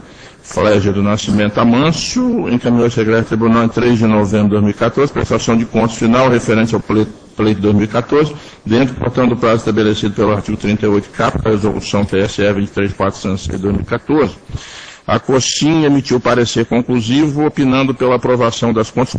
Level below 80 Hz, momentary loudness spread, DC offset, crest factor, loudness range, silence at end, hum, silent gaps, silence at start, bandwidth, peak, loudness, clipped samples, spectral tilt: -36 dBFS; 6 LU; under 0.1%; 14 dB; 3 LU; 0 s; none; none; 0.2 s; 9.8 kHz; 0 dBFS; -14 LUFS; under 0.1%; -6 dB/octave